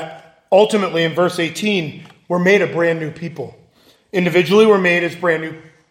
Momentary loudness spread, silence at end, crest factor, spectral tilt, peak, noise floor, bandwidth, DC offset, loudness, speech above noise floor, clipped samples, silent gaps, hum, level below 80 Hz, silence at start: 17 LU; 0.3 s; 16 dB; -5.5 dB/octave; 0 dBFS; -53 dBFS; 16 kHz; under 0.1%; -16 LUFS; 37 dB; under 0.1%; none; none; -64 dBFS; 0 s